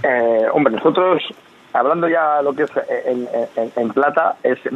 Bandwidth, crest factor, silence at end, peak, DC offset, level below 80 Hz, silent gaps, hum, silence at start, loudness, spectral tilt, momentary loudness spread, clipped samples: 7.4 kHz; 16 dB; 0 s; 0 dBFS; under 0.1%; -70 dBFS; none; none; 0 s; -17 LUFS; -7 dB/octave; 6 LU; under 0.1%